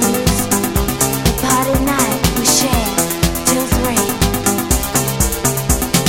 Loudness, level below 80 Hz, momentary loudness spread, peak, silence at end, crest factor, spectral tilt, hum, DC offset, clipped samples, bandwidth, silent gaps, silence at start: -15 LUFS; -24 dBFS; 3 LU; 0 dBFS; 0 s; 16 dB; -3.5 dB/octave; none; under 0.1%; under 0.1%; 17 kHz; none; 0 s